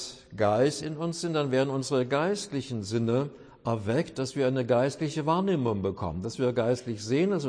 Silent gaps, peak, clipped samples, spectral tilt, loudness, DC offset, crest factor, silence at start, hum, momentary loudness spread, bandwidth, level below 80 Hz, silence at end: none; -12 dBFS; under 0.1%; -6 dB/octave; -28 LUFS; under 0.1%; 16 dB; 0 s; none; 7 LU; 10.5 kHz; -60 dBFS; 0 s